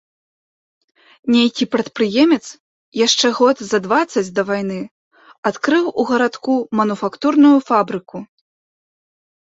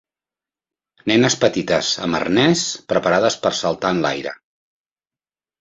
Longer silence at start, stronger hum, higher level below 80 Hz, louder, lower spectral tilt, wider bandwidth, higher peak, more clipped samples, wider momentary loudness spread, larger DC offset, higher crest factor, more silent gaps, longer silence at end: first, 1.25 s vs 1.05 s; neither; second, -64 dBFS vs -54 dBFS; about the same, -16 LUFS vs -18 LUFS; about the same, -4 dB/octave vs -4 dB/octave; about the same, 8 kHz vs 8.2 kHz; about the same, -2 dBFS vs 0 dBFS; neither; first, 15 LU vs 6 LU; neither; about the same, 16 dB vs 20 dB; first, 2.60-2.92 s, 4.91-5.11 s, 5.38-5.43 s vs none; about the same, 1.3 s vs 1.25 s